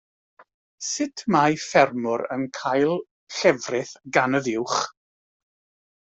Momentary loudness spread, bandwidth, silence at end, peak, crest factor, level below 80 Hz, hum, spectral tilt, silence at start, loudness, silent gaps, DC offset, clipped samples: 10 LU; 8.4 kHz; 1.1 s; -4 dBFS; 20 dB; -66 dBFS; none; -4 dB/octave; 0.4 s; -23 LUFS; 0.54-0.78 s, 3.11-3.27 s; under 0.1%; under 0.1%